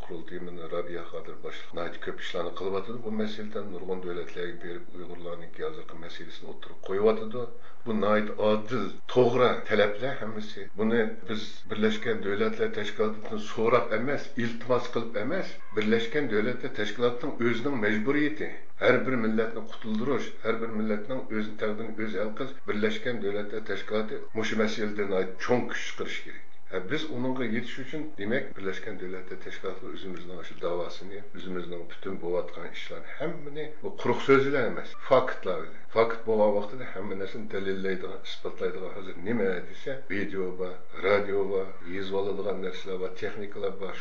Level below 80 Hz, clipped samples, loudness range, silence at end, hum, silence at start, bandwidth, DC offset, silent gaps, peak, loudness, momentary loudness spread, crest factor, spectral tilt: -68 dBFS; under 0.1%; 9 LU; 0 s; none; 0 s; 7.6 kHz; 4%; none; -8 dBFS; -30 LUFS; 14 LU; 22 dB; -6 dB/octave